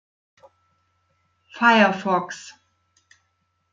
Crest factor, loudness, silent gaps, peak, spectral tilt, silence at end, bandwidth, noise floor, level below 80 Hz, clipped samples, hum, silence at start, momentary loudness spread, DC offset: 20 dB; -19 LUFS; none; -4 dBFS; -4.5 dB/octave; 1.25 s; 7.6 kHz; -71 dBFS; -74 dBFS; under 0.1%; none; 1.55 s; 22 LU; under 0.1%